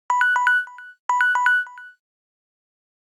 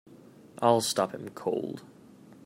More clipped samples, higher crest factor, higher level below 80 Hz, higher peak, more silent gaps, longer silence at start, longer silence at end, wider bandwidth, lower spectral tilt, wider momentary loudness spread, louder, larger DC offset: neither; second, 16 dB vs 22 dB; second, under -90 dBFS vs -76 dBFS; about the same, -6 dBFS vs -8 dBFS; first, 0.99-1.09 s vs none; second, 0.1 s vs 0.55 s; first, 1.2 s vs 0.1 s; second, 12.5 kHz vs 16 kHz; second, 5.5 dB/octave vs -4 dB/octave; first, 16 LU vs 13 LU; first, -19 LUFS vs -29 LUFS; neither